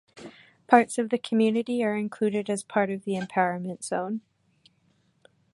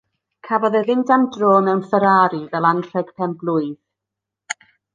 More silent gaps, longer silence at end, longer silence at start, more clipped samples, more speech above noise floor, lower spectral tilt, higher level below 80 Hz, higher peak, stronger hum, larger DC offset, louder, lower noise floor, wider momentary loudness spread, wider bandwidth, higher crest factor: neither; first, 1.35 s vs 0.4 s; second, 0.15 s vs 0.45 s; neither; second, 42 dB vs 67 dB; about the same, -5.5 dB/octave vs -6.5 dB/octave; second, -74 dBFS vs -68 dBFS; about the same, -2 dBFS vs -2 dBFS; neither; neither; second, -26 LUFS vs -18 LUFS; second, -67 dBFS vs -84 dBFS; about the same, 13 LU vs 15 LU; first, 11.5 kHz vs 9.8 kHz; first, 26 dB vs 18 dB